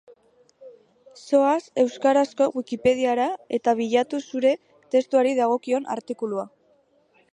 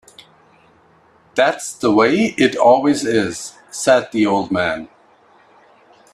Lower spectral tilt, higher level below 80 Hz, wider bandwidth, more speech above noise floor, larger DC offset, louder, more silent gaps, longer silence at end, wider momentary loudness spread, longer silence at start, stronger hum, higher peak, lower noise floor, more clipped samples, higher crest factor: about the same, -4.5 dB/octave vs -4.5 dB/octave; second, -68 dBFS vs -58 dBFS; second, 10.5 kHz vs 13 kHz; about the same, 40 dB vs 37 dB; neither; second, -23 LUFS vs -16 LUFS; neither; second, 0.85 s vs 1.3 s; second, 9 LU vs 12 LU; second, 0.6 s vs 1.35 s; neither; second, -6 dBFS vs 0 dBFS; first, -62 dBFS vs -52 dBFS; neither; about the same, 16 dB vs 18 dB